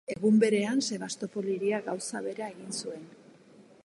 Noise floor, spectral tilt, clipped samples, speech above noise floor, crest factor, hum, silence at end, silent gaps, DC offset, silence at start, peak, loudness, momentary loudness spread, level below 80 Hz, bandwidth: -56 dBFS; -4.5 dB/octave; under 0.1%; 27 dB; 18 dB; none; 0.25 s; none; under 0.1%; 0.1 s; -12 dBFS; -30 LUFS; 13 LU; -76 dBFS; 11.5 kHz